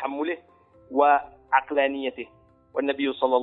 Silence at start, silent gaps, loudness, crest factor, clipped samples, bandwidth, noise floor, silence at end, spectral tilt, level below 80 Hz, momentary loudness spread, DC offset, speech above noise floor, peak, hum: 0 s; none; -25 LUFS; 20 dB; under 0.1%; 4.1 kHz; -56 dBFS; 0 s; -7.5 dB/octave; -66 dBFS; 13 LU; under 0.1%; 33 dB; -4 dBFS; none